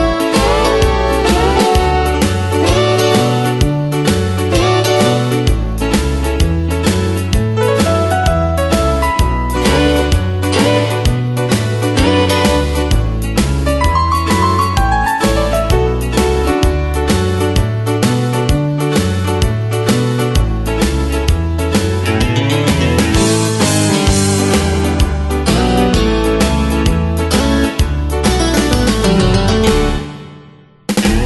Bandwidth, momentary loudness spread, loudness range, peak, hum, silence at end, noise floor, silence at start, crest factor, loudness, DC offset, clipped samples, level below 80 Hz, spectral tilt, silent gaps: 12.5 kHz; 4 LU; 2 LU; 0 dBFS; none; 0 s; -40 dBFS; 0 s; 12 dB; -13 LUFS; under 0.1%; under 0.1%; -20 dBFS; -5.5 dB/octave; none